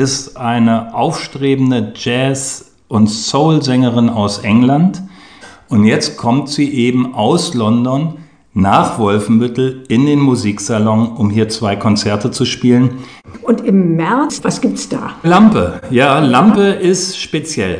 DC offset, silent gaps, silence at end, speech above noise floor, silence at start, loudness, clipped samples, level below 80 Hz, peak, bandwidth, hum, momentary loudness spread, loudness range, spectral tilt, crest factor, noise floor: 0.2%; none; 0 s; 26 dB; 0 s; -13 LUFS; under 0.1%; -46 dBFS; 0 dBFS; 10 kHz; none; 8 LU; 3 LU; -5.5 dB/octave; 12 dB; -38 dBFS